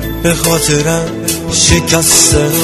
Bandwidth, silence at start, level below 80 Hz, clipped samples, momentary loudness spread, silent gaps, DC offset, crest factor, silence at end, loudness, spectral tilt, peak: 15.5 kHz; 0 s; -26 dBFS; under 0.1%; 9 LU; none; under 0.1%; 12 dB; 0 s; -9 LUFS; -3 dB/octave; 0 dBFS